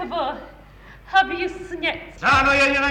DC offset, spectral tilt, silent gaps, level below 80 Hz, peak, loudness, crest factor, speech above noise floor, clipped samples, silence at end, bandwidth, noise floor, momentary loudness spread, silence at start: under 0.1%; -4 dB/octave; none; -44 dBFS; -4 dBFS; -20 LUFS; 16 dB; 24 dB; under 0.1%; 0 s; 16.5 kHz; -45 dBFS; 13 LU; 0 s